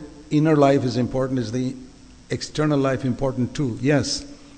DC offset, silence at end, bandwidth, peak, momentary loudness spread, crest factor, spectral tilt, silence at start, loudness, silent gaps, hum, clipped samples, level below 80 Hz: under 0.1%; 0 s; 9.4 kHz; -4 dBFS; 11 LU; 18 dB; -6 dB/octave; 0 s; -22 LUFS; none; none; under 0.1%; -46 dBFS